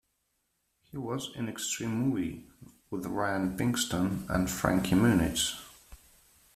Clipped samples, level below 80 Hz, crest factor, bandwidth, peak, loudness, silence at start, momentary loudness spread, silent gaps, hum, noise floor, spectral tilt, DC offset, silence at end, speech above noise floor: under 0.1%; -52 dBFS; 24 dB; 16 kHz; -8 dBFS; -30 LUFS; 0.95 s; 15 LU; none; none; -78 dBFS; -4.5 dB/octave; under 0.1%; 0.6 s; 48 dB